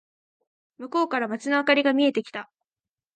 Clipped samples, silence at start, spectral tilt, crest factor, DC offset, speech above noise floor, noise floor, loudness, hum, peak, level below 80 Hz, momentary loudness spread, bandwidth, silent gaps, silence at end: under 0.1%; 0.8 s; -4 dB/octave; 20 dB; under 0.1%; over 67 dB; under -90 dBFS; -23 LUFS; none; -6 dBFS; -80 dBFS; 17 LU; 9.2 kHz; none; 0.7 s